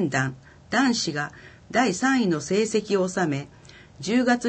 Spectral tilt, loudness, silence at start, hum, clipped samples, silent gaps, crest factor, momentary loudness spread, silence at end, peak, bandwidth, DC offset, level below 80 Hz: -4.5 dB/octave; -24 LUFS; 0 s; none; under 0.1%; none; 16 dB; 10 LU; 0 s; -8 dBFS; 8.8 kHz; under 0.1%; -60 dBFS